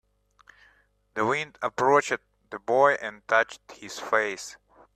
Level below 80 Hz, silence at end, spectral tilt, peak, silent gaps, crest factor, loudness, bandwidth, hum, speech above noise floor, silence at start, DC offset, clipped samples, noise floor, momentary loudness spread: -68 dBFS; 0.45 s; -3.5 dB/octave; -6 dBFS; none; 20 dB; -25 LUFS; 13.5 kHz; 50 Hz at -65 dBFS; 38 dB; 1.15 s; under 0.1%; under 0.1%; -63 dBFS; 17 LU